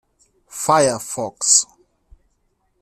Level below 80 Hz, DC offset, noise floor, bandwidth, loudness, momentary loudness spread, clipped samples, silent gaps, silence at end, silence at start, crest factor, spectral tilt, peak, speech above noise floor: -58 dBFS; under 0.1%; -66 dBFS; 15 kHz; -17 LUFS; 16 LU; under 0.1%; none; 1.15 s; 0.5 s; 20 dB; -2 dB/octave; -2 dBFS; 49 dB